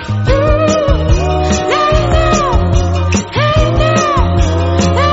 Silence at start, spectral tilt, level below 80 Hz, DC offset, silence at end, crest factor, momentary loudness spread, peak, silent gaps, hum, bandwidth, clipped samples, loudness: 0 s; -5.5 dB/octave; -18 dBFS; under 0.1%; 0 s; 10 dB; 2 LU; 0 dBFS; none; none; 8 kHz; under 0.1%; -12 LUFS